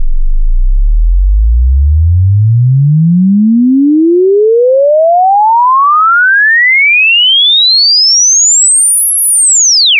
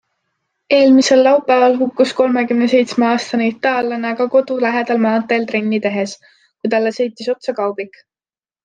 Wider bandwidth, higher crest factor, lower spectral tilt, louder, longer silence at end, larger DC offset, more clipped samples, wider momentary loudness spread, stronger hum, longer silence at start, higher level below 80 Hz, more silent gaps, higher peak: first, 11 kHz vs 9.4 kHz; second, 4 dB vs 14 dB; second, -3 dB/octave vs -4.5 dB/octave; first, -5 LUFS vs -15 LUFS; second, 0 s vs 0.75 s; neither; neither; about the same, 9 LU vs 10 LU; neither; second, 0 s vs 0.7 s; first, -14 dBFS vs -66 dBFS; neither; about the same, -4 dBFS vs -2 dBFS